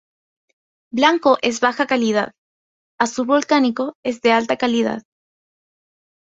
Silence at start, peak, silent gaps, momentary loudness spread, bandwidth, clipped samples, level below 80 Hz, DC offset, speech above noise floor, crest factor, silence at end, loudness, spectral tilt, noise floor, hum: 0.95 s; -2 dBFS; 2.38-2.98 s, 3.95-4.03 s; 8 LU; 8 kHz; under 0.1%; -64 dBFS; under 0.1%; over 72 dB; 20 dB; 1.2 s; -18 LUFS; -3.5 dB/octave; under -90 dBFS; none